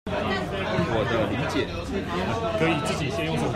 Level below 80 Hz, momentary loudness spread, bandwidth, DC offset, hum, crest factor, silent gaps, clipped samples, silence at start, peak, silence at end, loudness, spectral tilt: -44 dBFS; 4 LU; 14.5 kHz; under 0.1%; none; 16 dB; none; under 0.1%; 0.05 s; -10 dBFS; 0 s; -26 LUFS; -5.5 dB/octave